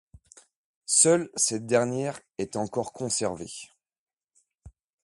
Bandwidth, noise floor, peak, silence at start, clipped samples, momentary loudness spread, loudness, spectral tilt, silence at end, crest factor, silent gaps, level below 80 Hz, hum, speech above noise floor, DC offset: 11.5 kHz; -71 dBFS; -6 dBFS; 0.9 s; under 0.1%; 18 LU; -25 LUFS; -3 dB/octave; 0.35 s; 22 dB; 3.98-4.07 s, 4.13-4.27 s; -62 dBFS; none; 44 dB; under 0.1%